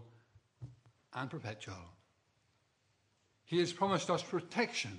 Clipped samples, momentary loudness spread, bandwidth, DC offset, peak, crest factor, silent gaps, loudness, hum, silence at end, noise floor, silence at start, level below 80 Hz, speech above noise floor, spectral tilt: under 0.1%; 22 LU; 11 kHz; under 0.1%; -16 dBFS; 24 dB; none; -37 LUFS; none; 0 s; -76 dBFS; 0 s; -78 dBFS; 40 dB; -4.5 dB/octave